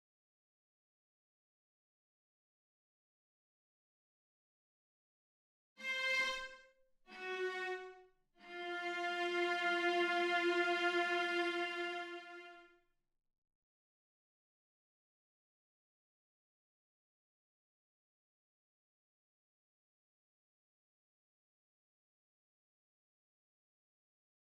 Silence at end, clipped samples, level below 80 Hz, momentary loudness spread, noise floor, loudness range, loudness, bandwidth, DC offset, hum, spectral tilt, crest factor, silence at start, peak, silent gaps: 11.9 s; under 0.1%; -82 dBFS; 17 LU; -74 dBFS; 11 LU; -37 LUFS; 12.5 kHz; under 0.1%; none; -2 dB/octave; 20 dB; 5.8 s; -24 dBFS; none